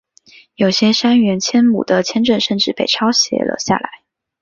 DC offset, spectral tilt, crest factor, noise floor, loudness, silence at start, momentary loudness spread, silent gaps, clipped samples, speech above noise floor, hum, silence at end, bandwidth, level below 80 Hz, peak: under 0.1%; -4 dB/octave; 14 dB; -47 dBFS; -14 LUFS; 0.6 s; 6 LU; none; under 0.1%; 32 dB; none; 0.45 s; 7.4 kHz; -56 dBFS; -2 dBFS